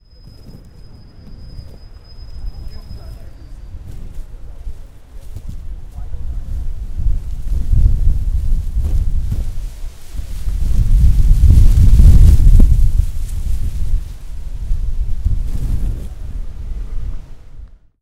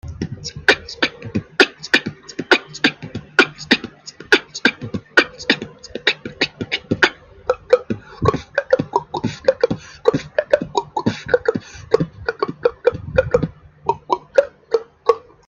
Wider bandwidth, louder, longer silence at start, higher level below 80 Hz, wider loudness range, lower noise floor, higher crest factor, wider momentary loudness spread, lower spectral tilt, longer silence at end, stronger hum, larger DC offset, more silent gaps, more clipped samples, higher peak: about the same, 11 kHz vs 11 kHz; about the same, -17 LUFS vs -19 LUFS; first, 0.25 s vs 0.05 s; first, -16 dBFS vs -46 dBFS; first, 22 LU vs 3 LU; about the same, -38 dBFS vs -36 dBFS; second, 14 dB vs 20 dB; first, 25 LU vs 10 LU; first, -7.5 dB/octave vs -4.5 dB/octave; about the same, 0.35 s vs 0.3 s; neither; neither; neither; first, 0.3% vs under 0.1%; about the same, 0 dBFS vs 0 dBFS